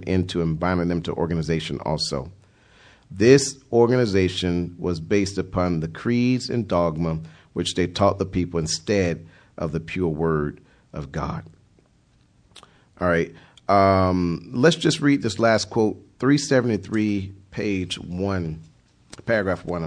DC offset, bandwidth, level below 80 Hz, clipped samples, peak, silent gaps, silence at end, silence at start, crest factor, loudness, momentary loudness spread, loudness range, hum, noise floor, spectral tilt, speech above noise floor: under 0.1%; 10.5 kHz; -46 dBFS; under 0.1%; 0 dBFS; none; 0 s; 0 s; 22 dB; -22 LUFS; 13 LU; 8 LU; none; -59 dBFS; -5.5 dB/octave; 37 dB